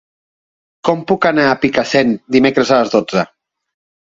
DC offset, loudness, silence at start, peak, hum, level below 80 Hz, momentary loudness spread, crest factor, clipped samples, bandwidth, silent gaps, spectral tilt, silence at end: under 0.1%; -14 LUFS; 0.85 s; 0 dBFS; none; -52 dBFS; 7 LU; 16 dB; under 0.1%; 7.8 kHz; none; -5.5 dB/octave; 0.9 s